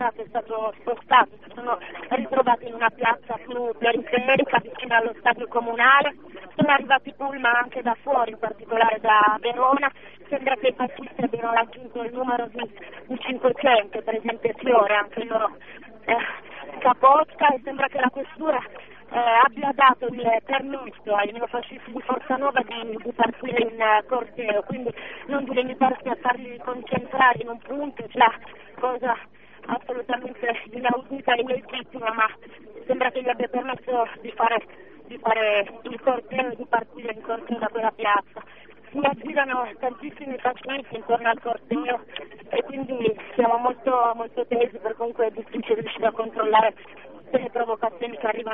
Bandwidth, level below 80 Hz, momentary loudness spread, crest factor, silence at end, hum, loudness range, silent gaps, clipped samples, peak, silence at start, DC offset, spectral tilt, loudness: 3.9 kHz; -66 dBFS; 13 LU; 20 dB; 0 s; 50 Hz at -65 dBFS; 5 LU; none; under 0.1%; -4 dBFS; 0 s; 0.3%; -1.5 dB/octave; -23 LUFS